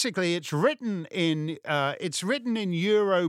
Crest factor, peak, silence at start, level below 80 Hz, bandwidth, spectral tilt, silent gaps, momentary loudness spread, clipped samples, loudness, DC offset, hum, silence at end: 16 dB; -10 dBFS; 0 s; -78 dBFS; 15.5 kHz; -5 dB/octave; none; 6 LU; under 0.1%; -27 LUFS; under 0.1%; none; 0 s